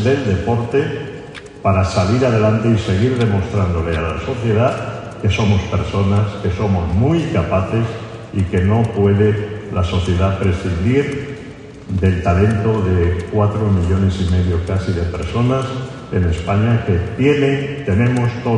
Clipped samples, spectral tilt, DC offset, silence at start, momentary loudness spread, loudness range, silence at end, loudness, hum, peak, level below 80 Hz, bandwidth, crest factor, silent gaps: under 0.1%; -7.5 dB/octave; under 0.1%; 0 s; 8 LU; 1 LU; 0 s; -17 LUFS; none; 0 dBFS; -28 dBFS; 9.8 kHz; 16 dB; none